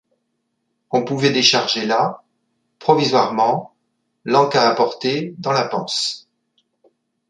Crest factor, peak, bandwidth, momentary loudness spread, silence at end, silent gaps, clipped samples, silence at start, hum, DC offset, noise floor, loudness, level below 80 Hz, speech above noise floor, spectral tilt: 20 dB; 0 dBFS; 11 kHz; 10 LU; 1.1 s; none; under 0.1%; 0.9 s; none; under 0.1%; -72 dBFS; -18 LUFS; -66 dBFS; 55 dB; -4 dB/octave